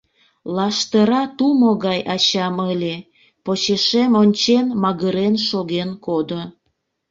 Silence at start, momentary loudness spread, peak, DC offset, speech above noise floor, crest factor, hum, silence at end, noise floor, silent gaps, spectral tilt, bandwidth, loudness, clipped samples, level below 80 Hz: 0.45 s; 12 LU; -4 dBFS; under 0.1%; 53 dB; 16 dB; none; 0.6 s; -71 dBFS; none; -5 dB/octave; 7.6 kHz; -18 LUFS; under 0.1%; -60 dBFS